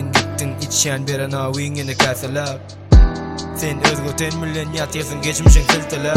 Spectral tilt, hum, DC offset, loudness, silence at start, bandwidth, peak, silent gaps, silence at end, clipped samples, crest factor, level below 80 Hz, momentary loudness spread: -4 dB/octave; none; under 0.1%; -18 LUFS; 0 s; 16 kHz; 0 dBFS; none; 0 s; under 0.1%; 16 dB; -20 dBFS; 10 LU